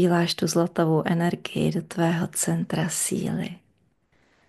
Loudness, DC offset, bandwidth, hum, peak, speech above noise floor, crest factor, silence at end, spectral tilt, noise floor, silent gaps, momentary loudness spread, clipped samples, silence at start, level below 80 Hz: -24 LUFS; under 0.1%; 12.5 kHz; none; -8 dBFS; 42 dB; 18 dB; 0.9 s; -5 dB/octave; -66 dBFS; none; 5 LU; under 0.1%; 0 s; -62 dBFS